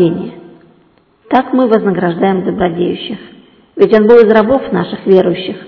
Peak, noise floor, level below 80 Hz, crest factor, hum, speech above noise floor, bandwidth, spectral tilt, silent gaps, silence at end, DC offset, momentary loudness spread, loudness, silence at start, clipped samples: 0 dBFS; -50 dBFS; -46 dBFS; 12 dB; none; 40 dB; 6 kHz; -9 dB/octave; none; 0 s; under 0.1%; 16 LU; -11 LUFS; 0 s; 1%